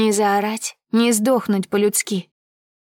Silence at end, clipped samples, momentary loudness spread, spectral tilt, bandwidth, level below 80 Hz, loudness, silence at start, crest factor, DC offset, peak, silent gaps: 0.75 s; under 0.1%; 9 LU; -4 dB/octave; 18 kHz; -72 dBFS; -19 LUFS; 0 s; 14 dB; under 0.1%; -6 dBFS; none